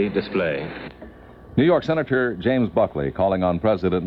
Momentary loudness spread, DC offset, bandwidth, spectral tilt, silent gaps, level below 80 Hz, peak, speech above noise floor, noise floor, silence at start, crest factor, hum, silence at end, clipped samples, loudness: 10 LU; under 0.1%; 6.2 kHz; -9 dB/octave; none; -46 dBFS; -6 dBFS; 22 dB; -43 dBFS; 0 s; 14 dB; none; 0 s; under 0.1%; -21 LUFS